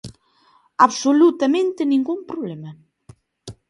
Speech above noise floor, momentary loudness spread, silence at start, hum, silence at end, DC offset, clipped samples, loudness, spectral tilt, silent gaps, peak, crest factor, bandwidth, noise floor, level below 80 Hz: 40 dB; 18 LU; 0.05 s; none; 0.15 s; under 0.1%; under 0.1%; -18 LUFS; -5 dB/octave; none; 0 dBFS; 20 dB; 11 kHz; -58 dBFS; -60 dBFS